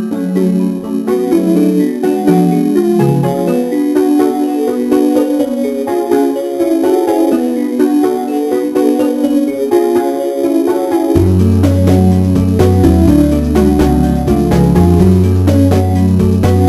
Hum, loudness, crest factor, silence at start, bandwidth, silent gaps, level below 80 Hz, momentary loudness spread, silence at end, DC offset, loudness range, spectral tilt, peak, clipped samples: none; -12 LUFS; 10 dB; 0 s; 16 kHz; none; -26 dBFS; 5 LU; 0 s; under 0.1%; 3 LU; -8 dB/octave; 0 dBFS; under 0.1%